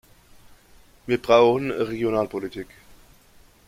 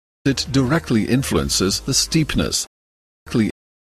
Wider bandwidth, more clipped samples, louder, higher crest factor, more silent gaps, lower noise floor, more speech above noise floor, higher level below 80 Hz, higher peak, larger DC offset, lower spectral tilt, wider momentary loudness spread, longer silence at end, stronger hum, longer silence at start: first, 15.5 kHz vs 13.5 kHz; neither; second, -22 LUFS vs -19 LUFS; about the same, 20 dB vs 16 dB; second, none vs 2.67-3.26 s; second, -54 dBFS vs under -90 dBFS; second, 32 dB vs over 71 dB; second, -54 dBFS vs -36 dBFS; about the same, -4 dBFS vs -4 dBFS; neither; first, -6 dB/octave vs -4 dB/octave; first, 22 LU vs 6 LU; first, 1.05 s vs 0.3 s; neither; first, 1.05 s vs 0.25 s